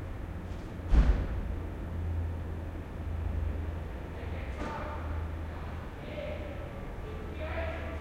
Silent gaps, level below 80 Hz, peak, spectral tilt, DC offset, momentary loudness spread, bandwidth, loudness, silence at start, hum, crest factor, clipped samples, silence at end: none; -36 dBFS; -14 dBFS; -8 dB/octave; under 0.1%; 10 LU; 8.6 kHz; -37 LUFS; 0 s; none; 20 dB; under 0.1%; 0 s